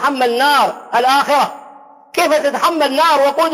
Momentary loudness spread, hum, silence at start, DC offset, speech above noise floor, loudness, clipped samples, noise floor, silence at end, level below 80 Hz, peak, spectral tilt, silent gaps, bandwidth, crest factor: 4 LU; none; 0 s; under 0.1%; 27 dB; -14 LUFS; under 0.1%; -40 dBFS; 0 s; -64 dBFS; -4 dBFS; -2 dB/octave; none; 16 kHz; 10 dB